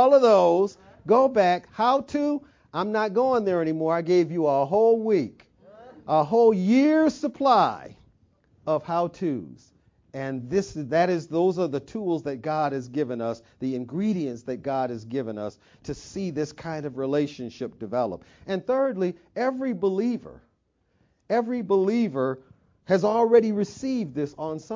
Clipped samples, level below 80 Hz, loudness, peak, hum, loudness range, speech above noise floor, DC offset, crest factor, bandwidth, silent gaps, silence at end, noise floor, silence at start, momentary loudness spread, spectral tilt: under 0.1%; -62 dBFS; -24 LUFS; -6 dBFS; none; 8 LU; 46 dB; under 0.1%; 18 dB; 7.6 kHz; none; 0 s; -70 dBFS; 0 s; 14 LU; -7 dB/octave